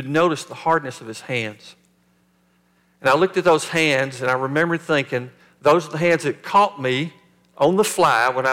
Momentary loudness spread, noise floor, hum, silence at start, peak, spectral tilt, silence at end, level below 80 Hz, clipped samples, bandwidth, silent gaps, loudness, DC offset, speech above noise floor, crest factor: 10 LU; -61 dBFS; none; 0 s; -4 dBFS; -4.5 dB/octave; 0 s; -66 dBFS; under 0.1%; 17 kHz; none; -19 LUFS; under 0.1%; 42 dB; 16 dB